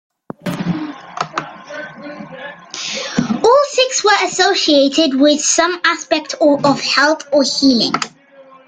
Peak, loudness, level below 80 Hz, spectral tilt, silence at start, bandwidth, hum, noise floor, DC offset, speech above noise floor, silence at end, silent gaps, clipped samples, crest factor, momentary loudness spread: 0 dBFS; -14 LUFS; -56 dBFS; -3 dB/octave; 0.45 s; 10 kHz; none; -43 dBFS; under 0.1%; 30 dB; 0.25 s; none; under 0.1%; 16 dB; 18 LU